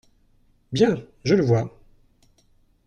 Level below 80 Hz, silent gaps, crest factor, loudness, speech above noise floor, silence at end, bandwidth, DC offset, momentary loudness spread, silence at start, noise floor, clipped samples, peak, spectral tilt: -56 dBFS; none; 18 dB; -22 LUFS; 40 dB; 1.2 s; 8.8 kHz; under 0.1%; 11 LU; 0.7 s; -60 dBFS; under 0.1%; -6 dBFS; -7 dB/octave